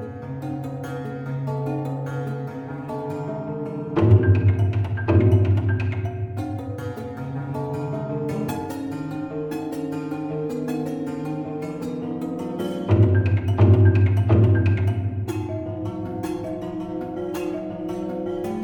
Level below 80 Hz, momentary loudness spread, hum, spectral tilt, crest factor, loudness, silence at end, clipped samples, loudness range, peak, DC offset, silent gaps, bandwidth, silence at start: -46 dBFS; 13 LU; none; -9 dB/octave; 20 dB; -24 LUFS; 0 s; under 0.1%; 10 LU; -4 dBFS; under 0.1%; none; 8.4 kHz; 0 s